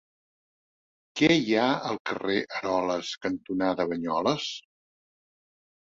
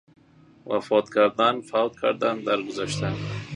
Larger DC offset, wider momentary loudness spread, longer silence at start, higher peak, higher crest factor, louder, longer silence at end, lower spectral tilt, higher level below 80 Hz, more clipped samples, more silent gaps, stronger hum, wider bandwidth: neither; about the same, 9 LU vs 9 LU; first, 1.15 s vs 0.65 s; second, -8 dBFS vs -4 dBFS; about the same, 20 dB vs 20 dB; second, -27 LUFS vs -24 LUFS; first, 1.35 s vs 0 s; about the same, -5 dB/octave vs -5.5 dB/octave; second, -64 dBFS vs -58 dBFS; neither; first, 2.00-2.05 s vs none; neither; second, 7.8 kHz vs 11 kHz